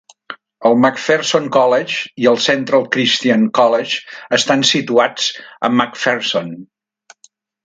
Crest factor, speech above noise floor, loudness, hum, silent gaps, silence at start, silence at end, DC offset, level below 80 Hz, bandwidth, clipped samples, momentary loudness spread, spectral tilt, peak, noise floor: 16 dB; 38 dB; -15 LUFS; none; none; 0.3 s; 1 s; under 0.1%; -64 dBFS; 9.4 kHz; under 0.1%; 9 LU; -3.5 dB/octave; 0 dBFS; -53 dBFS